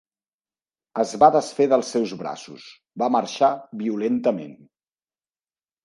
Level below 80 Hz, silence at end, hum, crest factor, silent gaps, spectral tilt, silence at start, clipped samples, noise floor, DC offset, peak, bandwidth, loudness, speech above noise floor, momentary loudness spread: -70 dBFS; 1.3 s; none; 22 dB; none; -5 dB/octave; 0.95 s; under 0.1%; under -90 dBFS; under 0.1%; -2 dBFS; 11.5 kHz; -22 LUFS; over 68 dB; 21 LU